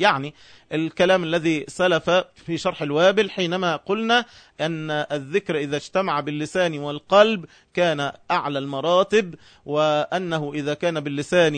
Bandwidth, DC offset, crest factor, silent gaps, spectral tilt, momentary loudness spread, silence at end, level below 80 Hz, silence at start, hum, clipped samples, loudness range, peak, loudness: 9.6 kHz; under 0.1%; 20 dB; none; -5 dB/octave; 9 LU; 0 s; -62 dBFS; 0 s; none; under 0.1%; 3 LU; -2 dBFS; -22 LUFS